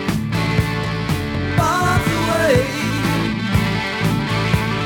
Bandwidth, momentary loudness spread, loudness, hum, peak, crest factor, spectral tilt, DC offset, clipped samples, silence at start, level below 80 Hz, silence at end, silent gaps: 19 kHz; 5 LU; -18 LUFS; none; -2 dBFS; 16 dB; -5.5 dB/octave; under 0.1%; under 0.1%; 0 s; -34 dBFS; 0 s; none